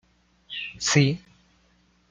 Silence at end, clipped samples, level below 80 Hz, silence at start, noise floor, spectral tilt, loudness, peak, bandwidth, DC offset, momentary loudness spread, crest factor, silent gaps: 0.95 s; under 0.1%; -60 dBFS; 0.5 s; -63 dBFS; -4 dB/octave; -24 LUFS; -4 dBFS; 9.4 kHz; under 0.1%; 15 LU; 24 dB; none